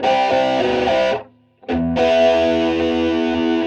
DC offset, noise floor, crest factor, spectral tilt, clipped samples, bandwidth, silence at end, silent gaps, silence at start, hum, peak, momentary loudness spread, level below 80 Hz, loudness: under 0.1%; -40 dBFS; 12 dB; -5.5 dB/octave; under 0.1%; 8.8 kHz; 0 s; none; 0 s; none; -4 dBFS; 8 LU; -42 dBFS; -17 LUFS